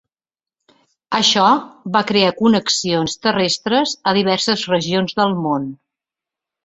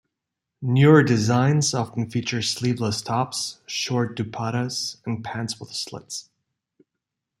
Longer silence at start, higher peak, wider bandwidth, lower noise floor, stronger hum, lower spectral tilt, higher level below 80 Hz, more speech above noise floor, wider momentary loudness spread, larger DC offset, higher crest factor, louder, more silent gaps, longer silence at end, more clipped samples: first, 1.1 s vs 0.6 s; about the same, -2 dBFS vs -2 dBFS; second, 8.4 kHz vs 13 kHz; first, under -90 dBFS vs -84 dBFS; neither; about the same, -4 dB/octave vs -5 dB/octave; about the same, -58 dBFS vs -62 dBFS; first, over 73 dB vs 61 dB; second, 6 LU vs 14 LU; neither; about the same, 18 dB vs 20 dB; first, -17 LUFS vs -23 LUFS; neither; second, 0.9 s vs 1.2 s; neither